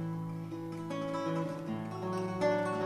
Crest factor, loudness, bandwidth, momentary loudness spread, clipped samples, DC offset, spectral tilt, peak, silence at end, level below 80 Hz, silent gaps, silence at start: 16 dB; -36 LUFS; 13.5 kHz; 9 LU; under 0.1%; under 0.1%; -7 dB/octave; -20 dBFS; 0 s; -68 dBFS; none; 0 s